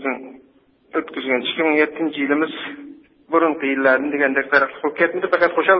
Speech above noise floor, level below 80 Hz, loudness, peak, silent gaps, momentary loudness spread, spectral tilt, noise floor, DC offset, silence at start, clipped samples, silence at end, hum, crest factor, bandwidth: 37 dB; -66 dBFS; -19 LUFS; 0 dBFS; none; 10 LU; -9 dB/octave; -55 dBFS; under 0.1%; 0 s; under 0.1%; 0 s; none; 18 dB; 5.8 kHz